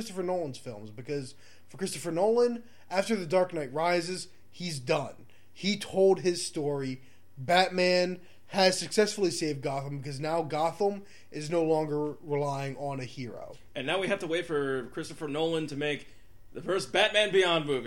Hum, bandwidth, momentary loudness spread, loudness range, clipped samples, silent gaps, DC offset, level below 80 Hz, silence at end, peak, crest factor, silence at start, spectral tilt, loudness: none; 16.5 kHz; 16 LU; 5 LU; under 0.1%; none; 0.4%; -66 dBFS; 0 s; -8 dBFS; 22 dB; 0 s; -4.5 dB/octave; -29 LUFS